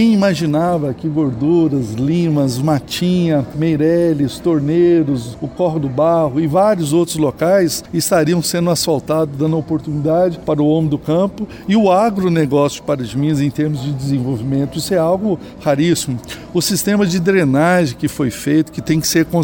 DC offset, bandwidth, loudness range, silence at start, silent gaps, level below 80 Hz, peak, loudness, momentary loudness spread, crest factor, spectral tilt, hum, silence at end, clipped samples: under 0.1%; 17 kHz; 2 LU; 0 s; none; -44 dBFS; -2 dBFS; -16 LUFS; 6 LU; 12 dB; -6 dB/octave; none; 0 s; under 0.1%